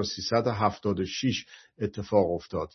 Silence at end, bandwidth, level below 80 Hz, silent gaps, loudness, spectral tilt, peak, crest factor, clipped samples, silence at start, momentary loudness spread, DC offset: 0.1 s; 6.4 kHz; -60 dBFS; none; -28 LUFS; -5.5 dB/octave; -10 dBFS; 18 dB; under 0.1%; 0 s; 9 LU; under 0.1%